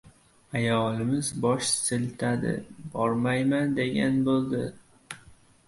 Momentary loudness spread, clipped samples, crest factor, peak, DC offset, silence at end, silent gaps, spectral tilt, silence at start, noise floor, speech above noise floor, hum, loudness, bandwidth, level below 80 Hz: 13 LU; under 0.1%; 16 dB; -12 dBFS; under 0.1%; 0.35 s; none; -5 dB/octave; 0.05 s; -55 dBFS; 28 dB; none; -27 LUFS; 11.5 kHz; -60 dBFS